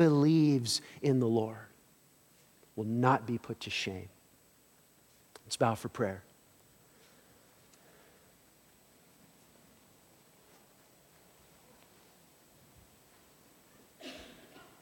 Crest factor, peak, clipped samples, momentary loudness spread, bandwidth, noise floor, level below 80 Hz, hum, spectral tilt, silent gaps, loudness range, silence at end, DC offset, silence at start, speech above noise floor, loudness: 22 dB; -14 dBFS; under 0.1%; 26 LU; 17.5 kHz; -65 dBFS; -74 dBFS; none; -6 dB/octave; none; 23 LU; 0.55 s; under 0.1%; 0 s; 34 dB; -31 LUFS